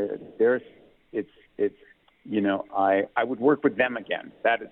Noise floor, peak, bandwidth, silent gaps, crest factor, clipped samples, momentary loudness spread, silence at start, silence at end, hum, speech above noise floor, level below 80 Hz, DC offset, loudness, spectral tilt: -58 dBFS; -8 dBFS; 4.1 kHz; none; 18 dB; under 0.1%; 11 LU; 0 s; 0.05 s; none; 33 dB; -70 dBFS; under 0.1%; -26 LUFS; -9 dB/octave